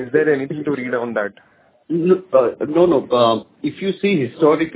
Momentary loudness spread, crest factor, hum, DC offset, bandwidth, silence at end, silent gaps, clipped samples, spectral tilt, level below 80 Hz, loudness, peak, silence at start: 9 LU; 16 dB; none; under 0.1%; 4 kHz; 0 s; none; under 0.1%; -10.5 dB/octave; -58 dBFS; -18 LUFS; -2 dBFS; 0 s